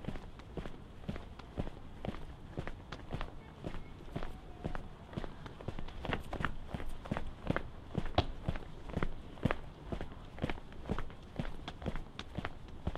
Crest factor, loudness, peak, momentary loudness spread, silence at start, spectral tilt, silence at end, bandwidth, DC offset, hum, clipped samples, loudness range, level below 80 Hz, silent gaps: 26 dB; -43 LUFS; -14 dBFS; 10 LU; 0 s; -7 dB/octave; 0 s; 10.5 kHz; under 0.1%; none; under 0.1%; 6 LU; -44 dBFS; none